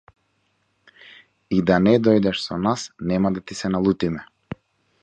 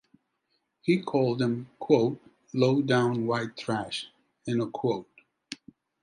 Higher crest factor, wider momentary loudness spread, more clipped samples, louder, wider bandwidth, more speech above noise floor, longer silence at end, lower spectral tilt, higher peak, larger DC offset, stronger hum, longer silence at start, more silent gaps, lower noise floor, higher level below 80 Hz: about the same, 20 dB vs 20 dB; about the same, 20 LU vs 19 LU; neither; first, -21 LUFS vs -28 LUFS; second, 9.2 kHz vs 10.5 kHz; about the same, 48 dB vs 50 dB; about the same, 0.5 s vs 0.5 s; about the same, -6.5 dB/octave vs -6.5 dB/octave; first, -2 dBFS vs -8 dBFS; neither; neither; first, 1.5 s vs 0.85 s; neither; second, -68 dBFS vs -77 dBFS; first, -50 dBFS vs -70 dBFS